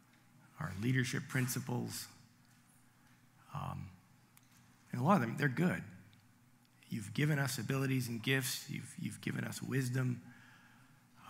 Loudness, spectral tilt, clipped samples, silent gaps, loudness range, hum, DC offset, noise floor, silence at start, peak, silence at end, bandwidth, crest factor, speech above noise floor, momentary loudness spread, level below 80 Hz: -37 LUFS; -5 dB/octave; under 0.1%; none; 7 LU; none; under 0.1%; -67 dBFS; 0.55 s; -16 dBFS; 0 s; 16 kHz; 22 dB; 30 dB; 13 LU; -78 dBFS